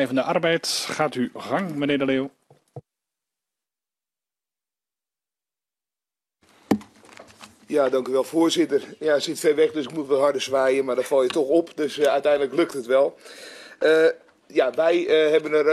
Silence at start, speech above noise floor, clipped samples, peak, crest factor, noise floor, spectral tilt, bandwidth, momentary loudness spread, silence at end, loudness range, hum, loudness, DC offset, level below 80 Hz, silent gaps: 0 s; over 69 dB; under 0.1%; -4 dBFS; 18 dB; under -90 dBFS; -4 dB/octave; 13.5 kHz; 8 LU; 0 s; 13 LU; none; -22 LUFS; under 0.1%; -68 dBFS; none